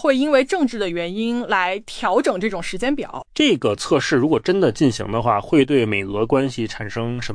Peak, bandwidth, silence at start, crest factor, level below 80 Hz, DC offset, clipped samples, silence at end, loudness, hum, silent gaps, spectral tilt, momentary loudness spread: -4 dBFS; 10.5 kHz; 0 s; 14 dB; -46 dBFS; under 0.1%; under 0.1%; 0 s; -20 LUFS; none; none; -5.5 dB/octave; 8 LU